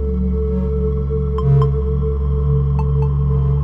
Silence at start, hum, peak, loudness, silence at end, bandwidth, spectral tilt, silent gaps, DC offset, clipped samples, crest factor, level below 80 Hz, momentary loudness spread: 0 s; none; -4 dBFS; -18 LUFS; 0 s; 3.4 kHz; -12 dB/octave; none; under 0.1%; under 0.1%; 12 dB; -20 dBFS; 4 LU